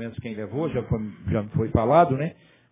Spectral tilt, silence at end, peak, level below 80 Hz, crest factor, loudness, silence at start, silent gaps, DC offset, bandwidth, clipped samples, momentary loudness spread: -12 dB/octave; 0.4 s; -4 dBFS; -42 dBFS; 20 dB; -24 LUFS; 0 s; none; under 0.1%; 3.8 kHz; under 0.1%; 13 LU